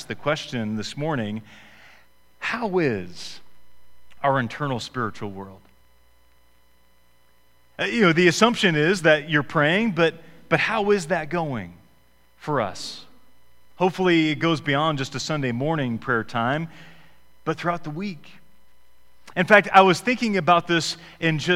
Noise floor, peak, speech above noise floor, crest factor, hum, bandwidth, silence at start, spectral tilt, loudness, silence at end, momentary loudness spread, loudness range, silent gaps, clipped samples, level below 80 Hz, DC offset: -62 dBFS; 0 dBFS; 40 dB; 24 dB; none; 16 kHz; 0 s; -5 dB/octave; -22 LUFS; 0 s; 17 LU; 10 LU; none; under 0.1%; -56 dBFS; 0.2%